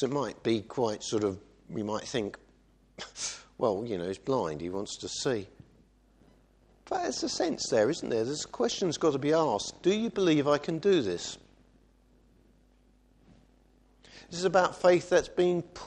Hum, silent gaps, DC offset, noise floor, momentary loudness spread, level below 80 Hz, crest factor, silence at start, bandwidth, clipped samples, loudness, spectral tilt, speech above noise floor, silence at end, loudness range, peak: none; none; under 0.1%; -63 dBFS; 11 LU; -62 dBFS; 20 dB; 0 s; 10 kHz; under 0.1%; -30 LUFS; -4.5 dB/octave; 34 dB; 0 s; 7 LU; -10 dBFS